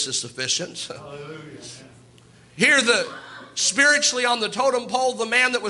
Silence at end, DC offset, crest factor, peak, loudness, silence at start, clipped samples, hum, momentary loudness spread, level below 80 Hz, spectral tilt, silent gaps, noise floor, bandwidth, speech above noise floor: 0 s; under 0.1%; 18 dB; -4 dBFS; -20 LUFS; 0 s; under 0.1%; none; 22 LU; -68 dBFS; -1 dB/octave; none; -51 dBFS; 11.5 kHz; 29 dB